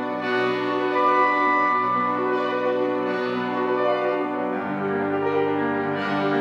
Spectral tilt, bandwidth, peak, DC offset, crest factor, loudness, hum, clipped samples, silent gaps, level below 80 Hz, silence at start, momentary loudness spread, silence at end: -7 dB/octave; 7.4 kHz; -8 dBFS; under 0.1%; 14 dB; -22 LUFS; none; under 0.1%; none; -80 dBFS; 0 s; 6 LU; 0 s